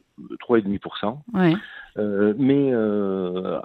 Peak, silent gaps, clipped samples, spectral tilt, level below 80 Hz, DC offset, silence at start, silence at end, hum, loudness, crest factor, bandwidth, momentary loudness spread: -4 dBFS; none; under 0.1%; -10 dB/octave; -60 dBFS; under 0.1%; 0.2 s; 0 s; none; -22 LUFS; 18 dB; 5.2 kHz; 10 LU